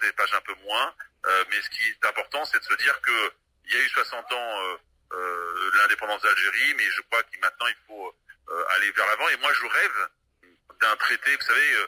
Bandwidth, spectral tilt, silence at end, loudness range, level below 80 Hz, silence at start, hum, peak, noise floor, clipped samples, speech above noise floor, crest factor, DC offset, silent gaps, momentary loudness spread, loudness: 16 kHz; 1 dB/octave; 0 s; 2 LU; -70 dBFS; 0 s; none; -10 dBFS; -62 dBFS; under 0.1%; 37 dB; 16 dB; under 0.1%; none; 10 LU; -23 LUFS